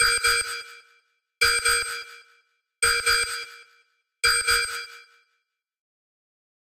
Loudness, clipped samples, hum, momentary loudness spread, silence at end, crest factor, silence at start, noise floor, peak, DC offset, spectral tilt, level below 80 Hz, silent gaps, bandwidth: -22 LUFS; under 0.1%; none; 18 LU; 1.65 s; 20 dB; 0 s; -77 dBFS; -6 dBFS; under 0.1%; 2 dB/octave; -50 dBFS; none; 16 kHz